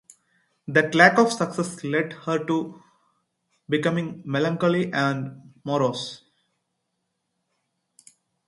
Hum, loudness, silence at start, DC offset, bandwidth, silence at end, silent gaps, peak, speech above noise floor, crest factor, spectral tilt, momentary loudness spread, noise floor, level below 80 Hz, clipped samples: none; -23 LUFS; 0.7 s; under 0.1%; 11.5 kHz; 2.3 s; none; 0 dBFS; 55 dB; 24 dB; -5.5 dB/octave; 17 LU; -77 dBFS; -70 dBFS; under 0.1%